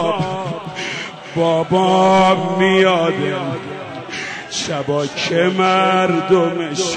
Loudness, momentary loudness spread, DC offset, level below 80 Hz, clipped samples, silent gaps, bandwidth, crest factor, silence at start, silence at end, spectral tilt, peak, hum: -16 LUFS; 13 LU; under 0.1%; -56 dBFS; under 0.1%; none; 9.4 kHz; 14 dB; 0 s; 0 s; -5 dB/octave; -2 dBFS; none